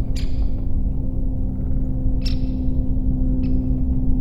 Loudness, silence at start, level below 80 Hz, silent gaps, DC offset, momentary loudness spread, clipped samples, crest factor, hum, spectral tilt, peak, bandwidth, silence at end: -24 LUFS; 0 s; -20 dBFS; none; under 0.1%; 4 LU; under 0.1%; 12 dB; none; -8.5 dB/octave; -6 dBFS; 7.4 kHz; 0 s